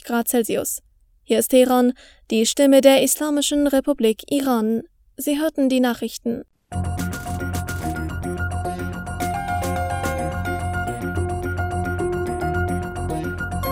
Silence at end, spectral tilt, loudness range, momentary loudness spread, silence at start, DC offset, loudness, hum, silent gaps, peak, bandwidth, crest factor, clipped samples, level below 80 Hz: 0 s; -5 dB/octave; 9 LU; 12 LU; 0.05 s; under 0.1%; -21 LUFS; none; none; 0 dBFS; over 20 kHz; 22 dB; under 0.1%; -40 dBFS